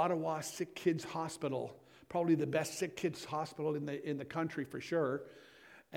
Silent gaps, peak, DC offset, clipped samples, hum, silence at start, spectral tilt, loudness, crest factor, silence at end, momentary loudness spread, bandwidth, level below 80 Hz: none; -20 dBFS; under 0.1%; under 0.1%; none; 0 s; -5.5 dB/octave; -38 LUFS; 18 dB; 0 s; 9 LU; 16.5 kHz; -76 dBFS